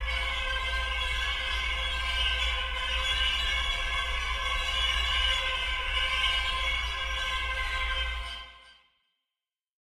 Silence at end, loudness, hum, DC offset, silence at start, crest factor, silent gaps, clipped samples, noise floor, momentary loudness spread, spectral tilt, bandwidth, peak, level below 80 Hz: 1.25 s; -28 LUFS; none; under 0.1%; 0 s; 16 dB; none; under 0.1%; under -90 dBFS; 5 LU; -1.5 dB/octave; 15 kHz; -14 dBFS; -36 dBFS